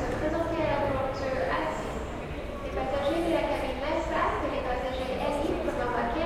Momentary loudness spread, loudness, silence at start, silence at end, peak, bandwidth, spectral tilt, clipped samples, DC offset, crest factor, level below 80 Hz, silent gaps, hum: 7 LU; -30 LUFS; 0 s; 0 s; -16 dBFS; 16 kHz; -6 dB/octave; under 0.1%; under 0.1%; 14 dB; -40 dBFS; none; none